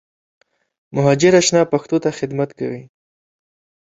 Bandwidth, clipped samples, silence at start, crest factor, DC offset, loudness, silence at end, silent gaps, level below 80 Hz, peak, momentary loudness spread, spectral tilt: 8 kHz; under 0.1%; 0.95 s; 18 dB; under 0.1%; -17 LUFS; 1.05 s; none; -58 dBFS; -2 dBFS; 15 LU; -5 dB/octave